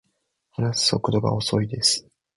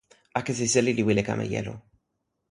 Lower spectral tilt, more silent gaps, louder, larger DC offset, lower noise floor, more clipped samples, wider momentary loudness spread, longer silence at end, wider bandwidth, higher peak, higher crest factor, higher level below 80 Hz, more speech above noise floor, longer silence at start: about the same, -4 dB/octave vs -4.5 dB/octave; neither; first, -22 LUFS vs -26 LUFS; neither; second, -74 dBFS vs -79 dBFS; neither; second, 7 LU vs 12 LU; second, 0.35 s vs 0.7 s; about the same, 11.5 kHz vs 11.5 kHz; about the same, -6 dBFS vs -8 dBFS; about the same, 20 dB vs 20 dB; about the same, -52 dBFS vs -56 dBFS; about the same, 51 dB vs 54 dB; first, 0.6 s vs 0.35 s